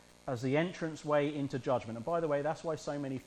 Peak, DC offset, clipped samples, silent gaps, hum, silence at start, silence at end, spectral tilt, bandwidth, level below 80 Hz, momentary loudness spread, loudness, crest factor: -18 dBFS; under 0.1%; under 0.1%; none; none; 0.25 s; 0 s; -6.5 dB/octave; 12 kHz; -66 dBFS; 6 LU; -35 LUFS; 16 dB